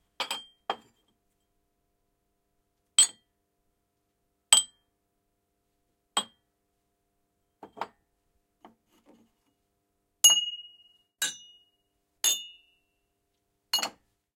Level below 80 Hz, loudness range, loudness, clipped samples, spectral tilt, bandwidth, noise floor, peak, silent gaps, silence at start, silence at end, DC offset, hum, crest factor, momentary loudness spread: -82 dBFS; 13 LU; -25 LUFS; under 0.1%; 3 dB/octave; 16.5 kHz; -78 dBFS; -4 dBFS; none; 0.2 s; 0.5 s; under 0.1%; none; 30 dB; 22 LU